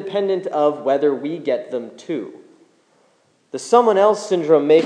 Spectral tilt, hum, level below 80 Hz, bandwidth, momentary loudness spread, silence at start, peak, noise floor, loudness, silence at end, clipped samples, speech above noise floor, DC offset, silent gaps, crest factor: -5.5 dB/octave; none; -86 dBFS; 10 kHz; 14 LU; 0 s; 0 dBFS; -59 dBFS; -18 LUFS; 0 s; under 0.1%; 42 dB; under 0.1%; none; 18 dB